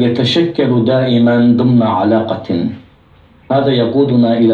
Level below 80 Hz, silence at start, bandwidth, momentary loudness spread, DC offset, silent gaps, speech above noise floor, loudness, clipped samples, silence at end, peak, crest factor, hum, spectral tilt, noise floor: -52 dBFS; 0 s; 7.2 kHz; 7 LU; under 0.1%; none; 34 dB; -12 LUFS; under 0.1%; 0 s; -2 dBFS; 10 dB; none; -8 dB/octave; -45 dBFS